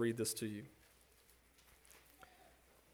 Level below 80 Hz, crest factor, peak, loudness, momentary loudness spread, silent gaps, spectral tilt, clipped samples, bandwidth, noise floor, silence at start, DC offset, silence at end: -76 dBFS; 20 dB; -26 dBFS; -42 LUFS; 27 LU; none; -4 dB/octave; under 0.1%; over 20 kHz; -69 dBFS; 0 s; under 0.1%; 0.45 s